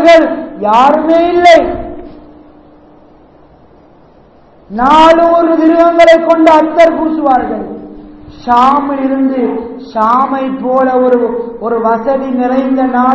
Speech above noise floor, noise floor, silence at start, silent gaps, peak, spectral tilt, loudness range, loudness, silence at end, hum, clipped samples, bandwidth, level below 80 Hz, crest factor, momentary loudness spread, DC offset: 34 dB; -42 dBFS; 0 s; none; 0 dBFS; -5.5 dB/octave; 6 LU; -9 LUFS; 0 s; none; 4%; 8 kHz; -40 dBFS; 10 dB; 13 LU; 0.2%